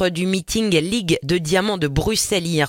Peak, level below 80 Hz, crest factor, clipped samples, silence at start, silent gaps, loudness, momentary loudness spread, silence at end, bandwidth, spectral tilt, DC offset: -2 dBFS; -38 dBFS; 16 dB; under 0.1%; 0 s; none; -19 LUFS; 2 LU; 0 s; 17 kHz; -4 dB/octave; under 0.1%